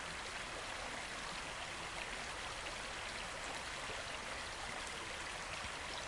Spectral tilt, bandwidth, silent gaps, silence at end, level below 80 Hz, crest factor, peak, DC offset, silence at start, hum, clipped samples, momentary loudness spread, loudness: -1.5 dB/octave; 11.5 kHz; none; 0 s; -60 dBFS; 16 dB; -28 dBFS; under 0.1%; 0 s; none; under 0.1%; 1 LU; -43 LUFS